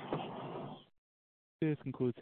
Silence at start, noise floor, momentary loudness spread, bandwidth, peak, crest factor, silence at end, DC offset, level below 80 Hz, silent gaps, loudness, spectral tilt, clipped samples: 0 s; under -90 dBFS; 12 LU; 4.3 kHz; -24 dBFS; 18 dB; 0 s; under 0.1%; -74 dBFS; 0.98-1.59 s; -40 LUFS; -7 dB/octave; under 0.1%